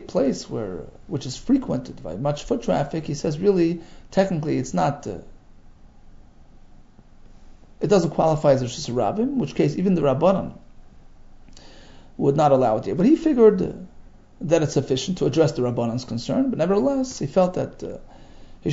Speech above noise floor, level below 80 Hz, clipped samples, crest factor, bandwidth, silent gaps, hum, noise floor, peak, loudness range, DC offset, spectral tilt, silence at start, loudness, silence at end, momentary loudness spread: 26 dB; -46 dBFS; under 0.1%; 20 dB; 8 kHz; none; none; -47 dBFS; -2 dBFS; 7 LU; under 0.1%; -6.5 dB/octave; 0 s; -22 LUFS; 0 s; 14 LU